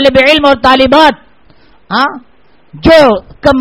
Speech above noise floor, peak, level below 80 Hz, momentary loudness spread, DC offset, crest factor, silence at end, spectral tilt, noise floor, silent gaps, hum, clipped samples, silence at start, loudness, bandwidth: 38 dB; 0 dBFS; -32 dBFS; 9 LU; 0.7%; 8 dB; 0 s; -5 dB/octave; -45 dBFS; none; none; 3%; 0 s; -7 LUFS; 14.5 kHz